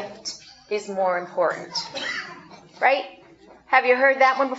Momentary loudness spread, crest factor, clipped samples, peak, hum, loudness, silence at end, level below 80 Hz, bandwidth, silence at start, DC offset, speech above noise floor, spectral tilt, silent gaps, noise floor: 17 LU; 20 dB; under 0.1%; -4 dBFS; none; -22 LUFS; 0 s; -70 dBFS; 8 kHz; 0 s; under 0.1%; 29 dB; -2.5 dB/octave; none; -50 dBFS